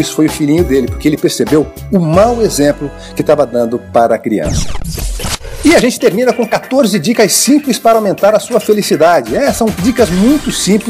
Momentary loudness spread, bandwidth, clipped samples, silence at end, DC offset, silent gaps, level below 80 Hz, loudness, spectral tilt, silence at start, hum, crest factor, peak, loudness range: 9 LU; 16 kHz; under 0.1%; 0 s; under 0.1%; none; -28 dBFS; -11 LUFS; -4.5 dB/octave; 0 s; none; 10 dB; 0 dBFS; 3 LU